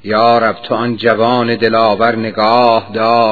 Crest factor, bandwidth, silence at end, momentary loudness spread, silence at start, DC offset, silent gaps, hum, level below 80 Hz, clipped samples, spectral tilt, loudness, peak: 12 dB; 5.4 kHz; 0 s; 4 LU; 0.05 s; 1%; none; none; -54 dBFS; 0.2%; -7.5 dB/octave; -12 LUFS; 0 dBFS